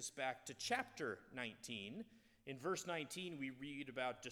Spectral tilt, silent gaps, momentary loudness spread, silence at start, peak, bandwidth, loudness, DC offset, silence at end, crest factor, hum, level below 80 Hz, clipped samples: -3 dB/octave; none; 10 LU; 0 s; -26 dBFS; 19 kHz; -46 LUFS; under 0.1%; 0 s; 22 dB; none; -80 dBFS; under 0.1%